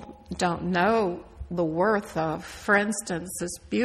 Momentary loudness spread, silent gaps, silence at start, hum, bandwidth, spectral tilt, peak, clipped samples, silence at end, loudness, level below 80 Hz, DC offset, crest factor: 10 LU; none; 0 s; none; 15 kHz; -5 dB/octave; -10 dBFS; under 0.1%; 0 s; -26 LUFS; -50 dBFS; under 0.1%; 18 dB